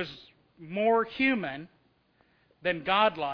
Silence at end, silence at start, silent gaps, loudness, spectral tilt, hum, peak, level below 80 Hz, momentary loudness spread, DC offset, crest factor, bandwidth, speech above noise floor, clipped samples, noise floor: 0 s; 0 s; none; -28 LUFS; -7 dB/octave; none; -10 dBFS; -66 dBFS; 14 LU; under 0.1%; 20 dB; 5.4 kHz; 39 dB; under 0.1%; -67 dBFS